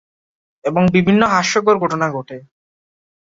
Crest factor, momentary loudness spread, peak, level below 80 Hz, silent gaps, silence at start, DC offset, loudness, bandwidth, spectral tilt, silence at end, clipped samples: 16 dB; 15 LU; -2 dBFS; -52 dBFS; none; 0.65 s; under 0.1%; -15 LUFS; 7.8 kHz; -5.5 dB/octave; 0.85 s; under 0.1%